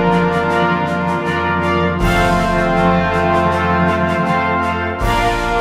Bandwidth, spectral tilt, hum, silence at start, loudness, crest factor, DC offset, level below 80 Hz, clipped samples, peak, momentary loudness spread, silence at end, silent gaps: 15 kHz; -6.5 dB/octave; none; 0 s; -15 LUFS; 14 dB; under 0.1%; -28 dBFS; under 0.1%; -2 dBFS; 3 LU; 0 s; none